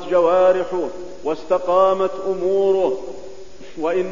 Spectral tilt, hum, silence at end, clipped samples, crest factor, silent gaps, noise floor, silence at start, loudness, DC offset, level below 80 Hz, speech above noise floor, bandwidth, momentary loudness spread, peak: -6 dB/octave; none; 0 s; under 0.1%; 14 dB; none; -39 dBFS; 0 s; -19 LUFS; 2%; -52 dBFS; 21 dB; 7.4 kHz; 16 LU; -4 dBFS